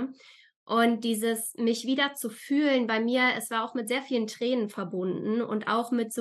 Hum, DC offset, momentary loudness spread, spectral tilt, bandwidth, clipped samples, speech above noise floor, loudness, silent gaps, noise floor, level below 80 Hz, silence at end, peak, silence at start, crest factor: none; under 0.1%; 6 LU; -4 dB/octave; 12.5 kHz; under 0.1%; 23 dB; -28 LUFS; 0.56-0.67 s; -50 dBFS; -86 dBFS; 0 s; -10 dBFS; 0 s; 18 dB